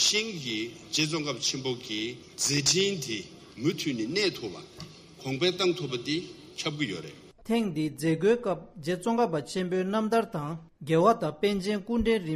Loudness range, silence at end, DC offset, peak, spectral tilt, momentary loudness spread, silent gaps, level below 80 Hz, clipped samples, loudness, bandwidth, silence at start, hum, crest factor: 3 LU; 0 s; under 0.1%; -10 dBFS; -3.5 dB/octave; 14 LU; none; -56 dBFS; under 0.1%; -28 LUFS; 15 kHz; 0 s; none; 20 dB